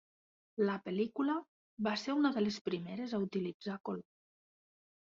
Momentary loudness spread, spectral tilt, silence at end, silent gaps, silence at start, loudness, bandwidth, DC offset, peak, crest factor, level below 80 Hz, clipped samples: 10 LU; -5 dB/octave; 1.15 s; 1.48-1.77 s, 2.61-2.65 s, 3.54-3.60 s; 0.55 s; -37 LUFS; 7.4 kHz; under 0.1%; -18 dBFS; 18 dB; -78 dBFS; under 0.1%